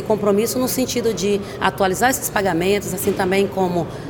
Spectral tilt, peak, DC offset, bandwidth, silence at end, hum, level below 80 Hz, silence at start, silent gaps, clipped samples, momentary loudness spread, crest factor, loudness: -4.5 dB/octave; 0 dBFS; under 0.1%; 19.5 kHz; 0 s; none; -46 dBFS; 0 s; none; under 0.1%; 4 LU; 18 dB; -19 LUFS